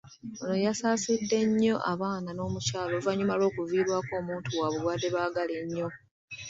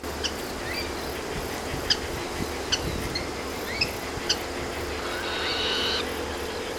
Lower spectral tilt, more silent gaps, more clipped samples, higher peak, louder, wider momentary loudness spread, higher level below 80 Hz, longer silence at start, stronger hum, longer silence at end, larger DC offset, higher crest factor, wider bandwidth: first, -5 dB/octave vs -3 dB/octave; first, 6.11-6.28 s vs none; neither; second, -14 dBFS vs -6 dBFS; about the same, -29 LUFS vs -28 LUFS; about the same, 8 LU vs 7 LU; second, -62 dBFS vs -42 dBFS; about the same, 0.05 s vs 0 s; neither; about the same, 0 s vs 0 s; neither; second, 14 dB vs 22 dB; second, 8 kHz vs 19.5 kHz